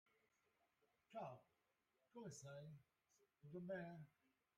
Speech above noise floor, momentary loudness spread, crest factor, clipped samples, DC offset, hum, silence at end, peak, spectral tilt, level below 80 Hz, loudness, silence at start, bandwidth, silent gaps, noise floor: 32 dB; 14 LU; 20 dB; under 0.1%; under 0.1%; none; 0.5 s; -40 dBFS; -6 dB/octave; under -90 dBFS; -57 LUFS; 1.1 s; 10 kHz; none; -88 dBFS